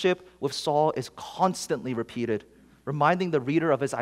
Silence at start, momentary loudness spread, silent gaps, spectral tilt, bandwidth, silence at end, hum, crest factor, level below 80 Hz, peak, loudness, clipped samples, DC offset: 0 s; 10 LU; none; -5.5 dB/octave; 15.5 kHz; 0 s; none; 20 dB; -64 dBFS; -8 dBFS; -27 LUFS; under 0.1%; under 0.1%